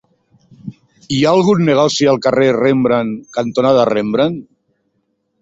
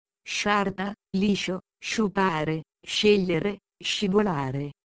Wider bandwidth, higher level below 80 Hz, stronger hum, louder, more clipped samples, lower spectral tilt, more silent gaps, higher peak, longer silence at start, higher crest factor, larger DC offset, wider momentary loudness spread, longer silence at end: second, 8 kHz vs 9.6 kHz; about the same, -54 dBFS vs -56 dBFS; neither; first, -14 LUFS vs -26 LUFS; neither; about the same, -5.5 dB/octave vs -5 dB/octave; neither; first, -2 dBFS vs -8 dBFS; first, 0.65 s vs 0.25 s; about the same, 14 dB vs 18 dB; neither; first, 18 LU vs 10 LU; first, 1 s vs 0.1 s